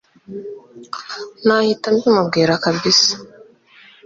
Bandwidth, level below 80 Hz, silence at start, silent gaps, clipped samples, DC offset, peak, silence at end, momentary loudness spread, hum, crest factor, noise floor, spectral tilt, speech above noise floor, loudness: 7.8 kHz; -60 dBFS; 0.3 s; none; under 0.1%; under 0.1%; -2 dBFS; 0.8 s; 20 LU; none; 16 dB; -48 dBFS; -3.5 dB/octave; 30 dB; -15 LUFS